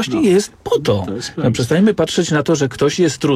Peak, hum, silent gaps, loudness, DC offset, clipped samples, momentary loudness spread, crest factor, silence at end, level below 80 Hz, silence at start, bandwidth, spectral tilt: -4 dBFS; none; none; -16 LUFS; under 0.1%; under 0.1%; 5 LU; 12 dB; 0 s; -46 dBFS; 0 s; 15.5 kHz; -5.5 dB/octave